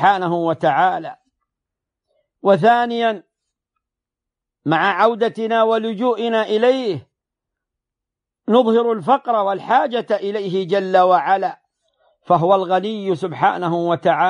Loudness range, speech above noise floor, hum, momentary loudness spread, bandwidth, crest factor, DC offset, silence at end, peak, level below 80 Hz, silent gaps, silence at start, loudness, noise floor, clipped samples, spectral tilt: 3 LU; 68 dB; none; 8 LU; 10 kHz; 16 dB; under 0.1%; 0 s; -2 dBFS; -70 dBFS; none; 0 s; -17 LUFS; -85 dBFS; under 0.1%; -7 dB/octave